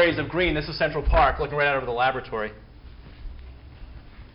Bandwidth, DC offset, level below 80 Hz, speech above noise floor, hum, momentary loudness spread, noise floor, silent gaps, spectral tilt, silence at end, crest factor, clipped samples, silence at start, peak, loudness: 5.6 kHz; under 0.1%; -34 dBFS; 20 dB; none; 24 LU; -44 dBFS; none; -10 dB/octave; 0.1 s; 18 dB; under 0.1%; 0 s; -8 dBFS; -24 LUFS